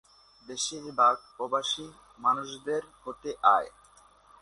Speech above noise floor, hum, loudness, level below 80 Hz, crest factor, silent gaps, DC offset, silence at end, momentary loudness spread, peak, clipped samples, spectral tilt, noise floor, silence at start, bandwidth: 30 dB; none; -28 LUFS; -68 dBFS; 22 dB; none; under 0.1%; 0.75 s; 17 LU; -8 dBFS; under 0.1%; -2 dB/octave; -59 dBFS; 0.5 s; 11.5 kHz